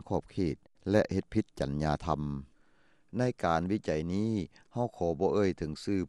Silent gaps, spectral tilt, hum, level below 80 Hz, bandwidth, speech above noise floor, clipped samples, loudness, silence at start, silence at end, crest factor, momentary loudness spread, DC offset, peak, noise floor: none; -7.5 dB/octave; none; -50 dBFS; 11.5 kHz; 37 dB; under 0.1%; -32 LUFS; 0.05 s; 0 s; 20 dB; 8 LU; under 0.1%; -12 dBFS; -68 dBFS